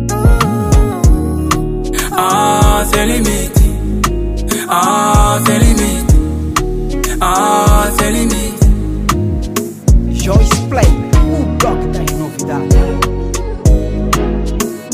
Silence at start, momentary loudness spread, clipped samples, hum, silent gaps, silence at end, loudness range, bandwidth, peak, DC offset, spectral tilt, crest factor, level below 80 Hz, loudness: 0 s; 7 LU; under 0.1%; none; none; 0 s; 2 LU; 16 kHz; 0 dBFS; under 0.1%; -5 dB/octave; 12 dB; -14 dBFS; -13 LUFS